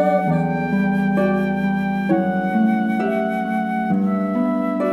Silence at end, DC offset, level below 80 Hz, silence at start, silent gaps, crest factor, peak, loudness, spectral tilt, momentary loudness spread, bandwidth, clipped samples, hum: 0 s; under 0.1%; -54 dBFS; 0 s; none; 12 dB; -6 dBFS; -20 LUFS; -9 dB/octave; 3 LU; 12 kHz; under 0.1%; none